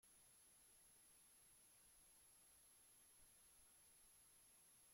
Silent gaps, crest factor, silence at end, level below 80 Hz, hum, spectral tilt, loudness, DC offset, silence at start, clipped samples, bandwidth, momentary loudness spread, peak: none; 12 dB; 0 s; -88 dBFS; none; -0.5 dB/octave; -69 LUFS; under 0.1%; 0 s; under 0.1%; 16.5 kHz; 0 LU; -60 dBFS